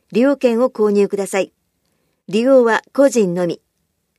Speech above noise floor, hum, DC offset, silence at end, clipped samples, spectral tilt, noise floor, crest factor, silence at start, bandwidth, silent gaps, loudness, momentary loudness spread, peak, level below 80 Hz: 54 dB; none; under 0.1%; 0.65 s; under 0.1%; -5.5 dB/octave; -69 dBFS; 14 dB; 0.1 s; 13.5 kHz; none; -16 LUFS; 10 LU; -2 dBFS; -70 dBFS